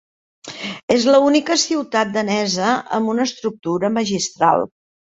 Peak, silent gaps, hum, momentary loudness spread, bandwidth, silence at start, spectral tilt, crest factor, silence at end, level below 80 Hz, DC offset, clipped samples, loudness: 0 dBFS; 0.83-0.88 s; none; 13 LU; 8.2 kHz; 0.45 s; -3.5 dB/octave; 18 dB; 0.4 s; -60 dBFS; under 0.1%; under 0.1%; -18 LUFS